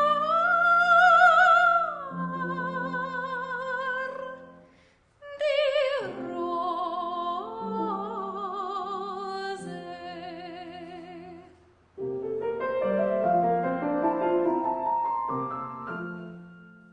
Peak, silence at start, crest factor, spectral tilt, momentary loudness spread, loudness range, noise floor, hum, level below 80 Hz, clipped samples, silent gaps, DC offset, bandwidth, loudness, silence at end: -6 dBFS; 0 s; 20 dB; -5.5 dB/octave; 21 LU; 14 LU; -61 dBFS; none; -72 dBFS; under 0.1%; none; under 0.1%; 10 kHz; -26 LUFS; 0.25 s